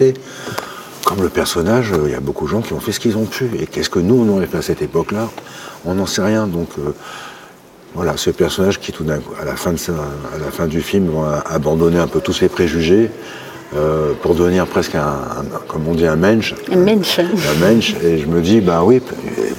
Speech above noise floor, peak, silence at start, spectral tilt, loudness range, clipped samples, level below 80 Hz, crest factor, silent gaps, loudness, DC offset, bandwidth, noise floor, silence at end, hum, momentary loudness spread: 25 dB; 0 dBFS; 0 s; -5.5 dB/octave; 6 LU; under 0.1%; -38 dBFS; 16 dB; none; -16 LUFS; under 0.1%; 17 kHz; -40 dBFS; 0 s; none; 12 LU